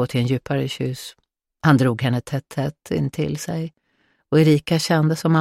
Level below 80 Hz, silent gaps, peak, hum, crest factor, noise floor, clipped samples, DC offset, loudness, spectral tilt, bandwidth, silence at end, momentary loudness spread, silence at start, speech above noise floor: -54 dBFS; none; -4 dBFS; none; 16 dB; -65 dBFS; under 0.1%; under 0.1%; -21 LUFS; -6.5 dB/octave; 15 kHz; 0 s; 11 LU; 0 s; 46 dB